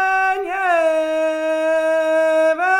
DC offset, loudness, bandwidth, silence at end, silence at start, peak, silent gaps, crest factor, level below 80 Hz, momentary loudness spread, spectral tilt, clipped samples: under 0.1%; -18 LUFS; 14.5 kHz; 0 s; 0 s; -6 dBFS; none; 12 dB; -60 dBFS; 4 LU; -2 dB/octave; under 0.1%